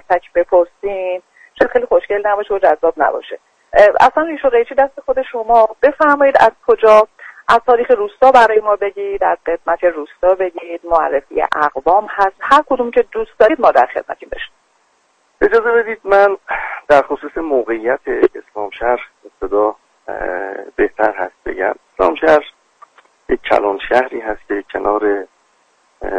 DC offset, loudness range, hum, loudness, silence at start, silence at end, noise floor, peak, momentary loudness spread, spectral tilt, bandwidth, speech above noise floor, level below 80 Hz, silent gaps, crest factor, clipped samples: under 0.1%; 7 LU; none; -14 LUFS; 0.1 s; 0 s; -58 dBFS; 0 dBFS; 13 LU; -5 dB/octave; 9.6 kHz; 44 dB; -44 dBFS; none; 14 dB; under 0.1%